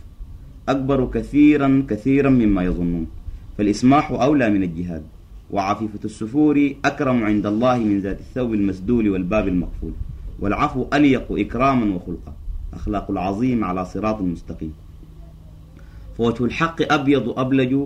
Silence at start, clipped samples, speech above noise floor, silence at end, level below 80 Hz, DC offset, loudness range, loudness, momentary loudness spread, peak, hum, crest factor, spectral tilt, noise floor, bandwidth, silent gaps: 0.05 s; under 0.1%; 22 dB; 0 s; -36 dBFS; under 0.1%; 7 LU; -20 LUFS; 16 LU; -4 dBFS; none; 16 dB; -7.5 dB/octave; -41 dBFS; 9.6 kHz; none